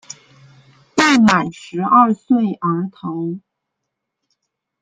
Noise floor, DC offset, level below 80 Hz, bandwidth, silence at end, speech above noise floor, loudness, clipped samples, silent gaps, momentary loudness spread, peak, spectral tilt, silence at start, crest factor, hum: -78 dBFS; under 0.1%; -58 dBFS; 9.4 kHz; 1.45 s; 62 dB; -16 LUFS; under 0.1%; none; 15 LU; -2 dBFS; -5 dB/octave; 0.95 s; 18 dB; none